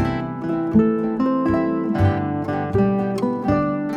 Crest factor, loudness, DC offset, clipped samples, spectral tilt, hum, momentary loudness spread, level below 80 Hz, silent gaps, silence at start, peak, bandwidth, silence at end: 16 dB; -21 LUFS; under 0.1%; under 0.1%; -9 dB/octave; none; 6 LU; -42 dBFS; none; 0 s; -4 dBFS; 9.2 kHz; 0 s